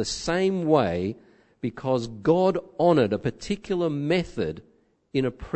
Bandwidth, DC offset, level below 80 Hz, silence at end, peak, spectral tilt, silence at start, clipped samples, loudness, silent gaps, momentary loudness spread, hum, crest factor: 8.6 kHz; under 0.1%; -50 dBFS; 0 s; -6 dBFS; -6 dB/octave; 0 s; under 0.1%; -25 LUFS; none; 11 LU; none; 18 dB